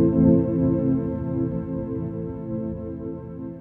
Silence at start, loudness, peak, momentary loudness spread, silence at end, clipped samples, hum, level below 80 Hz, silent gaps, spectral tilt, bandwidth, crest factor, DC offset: 0 s; -24 LUFS; -6 dBFS; 15 LU; 0 s; under 0.1%; none; -42 dBFS; none; -13.5 dB/octave; 2.8 kHz; 16 dB; under 0.1%